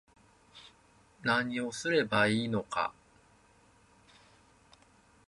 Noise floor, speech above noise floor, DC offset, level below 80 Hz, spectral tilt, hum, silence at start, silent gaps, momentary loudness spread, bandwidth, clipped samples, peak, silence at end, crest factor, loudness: -64 dBFS; 33 dB; under 0.1%; -68 dBFS; -4.5 dB/octave; none; 0.55 s; none; 23 LU; 11.5 kHz; under 0.1%; -14 dBFS; 2.35 s; 22 dB; -31 LUFS